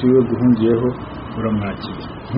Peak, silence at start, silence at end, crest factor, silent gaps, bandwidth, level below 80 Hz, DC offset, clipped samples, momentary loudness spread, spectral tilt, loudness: -4 dBFS; 0 s; 0 s; 14 dB; none; 5.4 kHz; -42 dBFS; under 0.1%; under 0.1%; 14 LU; -7.5 dB/octave; -18 LUFS